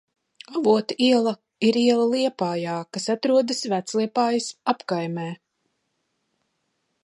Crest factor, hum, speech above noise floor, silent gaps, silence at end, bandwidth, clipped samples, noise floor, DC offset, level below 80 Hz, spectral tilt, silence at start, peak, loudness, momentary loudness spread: 18 dB; none; 52 dB; none; 1.7 s; 11.5 kHz; under 0.1%; -74 dBFS; under 0.1%; -76 dBFS; -5 dB/octave; 0.5 s; -6 dBFS; -23 LUFS; 10 LU